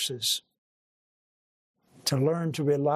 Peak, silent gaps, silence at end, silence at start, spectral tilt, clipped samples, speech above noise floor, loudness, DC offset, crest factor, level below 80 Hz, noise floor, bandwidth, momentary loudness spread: -12 dBFS; 0.58-1.74 s; 0 s; 0 s; -4.5 dB/octave; under 0.1%; over 63 dB; -28 LUFS; under 0.1%; 18 dB; -74 dBFS; under -90 dBFS; 15.5 kHz; 5 LU